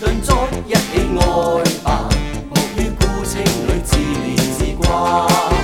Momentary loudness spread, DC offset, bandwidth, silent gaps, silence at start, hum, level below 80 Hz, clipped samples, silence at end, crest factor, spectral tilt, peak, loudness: 4 LU; 0.3%; 18.5 kHz; none; 0 s; none; -22 dBFS; under 0.1%; 0 s; 16 dB; -5 dB/octave; 0 dBFS; -17 LUFS